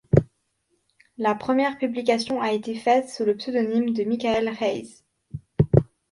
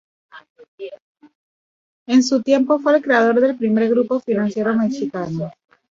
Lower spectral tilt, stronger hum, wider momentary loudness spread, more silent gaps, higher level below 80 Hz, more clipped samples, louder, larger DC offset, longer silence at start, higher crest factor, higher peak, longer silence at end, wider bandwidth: first, -7 dB/octave vs -5.5 dB/octave; neither; second, 7 LU vs 16 LU; second, none vs 0.50-0.55 s, 0.68-0.78 s, 1.00-1.15 s, 1.35-2.06 s; first, -46 dBFS vs -64 dBFS; neither; second, -24 LUFS vs -18 LUFS; neither; second, 0.15 s vs 0.35 s; about the same, 22 dB vs 18 dB; about the same, -2 dBFS vs -2 dBFS; second, 0.25 s vs 0.4 s; first, 11.5 kHz vs 7.6 kHz